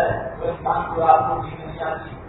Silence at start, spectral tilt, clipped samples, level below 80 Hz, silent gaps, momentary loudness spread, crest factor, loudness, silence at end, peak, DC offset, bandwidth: 0 s; -10.5 dB/octave; under 0.1%; -42 dBFS; none; 12 LU; 20 dB; -21 LUFS; 0 s; -2 dBFS; under 0.1%; 4.1 kHz